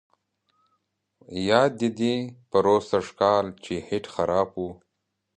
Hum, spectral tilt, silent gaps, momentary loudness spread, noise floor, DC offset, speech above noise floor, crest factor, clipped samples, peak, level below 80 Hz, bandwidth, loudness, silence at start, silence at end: none; -5.5 dB/octave; none; 11 LU; -79 dBFS; under 0.1%; 55 dB; 22 dB; under 0.1%; -2 dBFS; -56 dBFS; 10 kHz; -24 LUFS; 1.3 s; 0.65 s